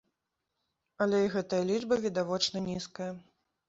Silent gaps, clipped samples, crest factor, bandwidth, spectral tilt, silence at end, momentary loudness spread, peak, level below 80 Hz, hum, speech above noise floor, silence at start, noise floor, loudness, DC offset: none; under 0.1%; 18 dB; 8 kHz; -4.5 dB/octave; 0.5 s; 11 LU; -14 dBFS; -68 dBFS; none; 54 dB; 1 s; -85 dBFS; -31 LUFS; under 0.1%